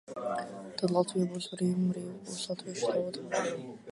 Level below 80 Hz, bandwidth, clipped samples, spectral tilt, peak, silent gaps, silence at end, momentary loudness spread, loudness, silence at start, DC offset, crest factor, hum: -74 dBFS; 11.5 kHz; under 0.1%; -5.5 dB/octave; -12 dBFS; none; 0 s; 9 LU; -33 LUFS; 0.1 s; under 0.1%; 20 dB; none